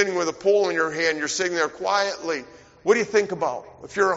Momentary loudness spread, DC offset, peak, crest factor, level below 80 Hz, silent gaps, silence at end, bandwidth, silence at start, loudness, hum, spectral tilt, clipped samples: 10 LU; under 0.1%; -6 dBFS; 18 dB; -64 dBFS; none; 0 s; 8 kHz; 0 s; -23 LUFS; none; -2 dB/octave; under 0.1%